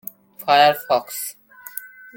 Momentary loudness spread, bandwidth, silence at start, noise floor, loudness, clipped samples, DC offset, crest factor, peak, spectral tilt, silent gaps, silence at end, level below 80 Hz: 20 LU; 17 kHz; 0.4 s; -38 dBFS; -18 LUFS; under 0.1%; under 0.1%; 18 dB; -2 dBFS; -2 dB/octave; none; 0.3 s; -72 dBFS